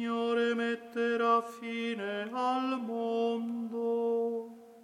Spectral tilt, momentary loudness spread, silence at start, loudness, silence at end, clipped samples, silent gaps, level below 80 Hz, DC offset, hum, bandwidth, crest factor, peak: -5 dB/octave; 7 LU; 0 s; -32 LUFS; 0 s; under 0.1%; none; -82 dBFS; under 0.1%; none; 11 kHz; 18 dB; -14 dBFS